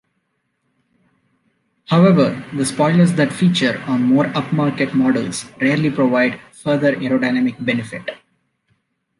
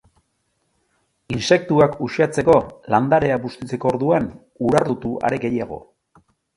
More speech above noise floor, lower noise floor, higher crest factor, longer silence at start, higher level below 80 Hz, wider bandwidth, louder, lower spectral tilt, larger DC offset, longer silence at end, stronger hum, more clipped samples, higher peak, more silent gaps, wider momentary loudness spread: about the same, 53 dB vs 51 dB; about the same, -70 dBFS vs -70 dBFS; about the same, 16 dB vs 20 dB; first, 1.9 s vs 1.3 s; second, -60 dBFS vs -50 dBFS; about the same, 11.5 kHz vs 11.5 kHz; about the same, -17 LUFS vs -19 LUFS; about the same, -6 dB/octave vs -6.5 dB/octave; neither; first, 1.05 s vs 0.75 s; neither; neither; about the same, -2 dBFS vs 0 dBFS; neither; second, 8 LU vs 11 LU